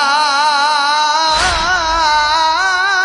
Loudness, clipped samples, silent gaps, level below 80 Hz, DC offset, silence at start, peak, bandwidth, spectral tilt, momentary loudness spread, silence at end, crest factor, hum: -12 LUFS; under 0.1%; none; -34 dBFS; under 0.1%; 0 s; -2 dBFS; 11 kHz; -0.5 dB/octave; 1 LU; 0 s; 12 dB; none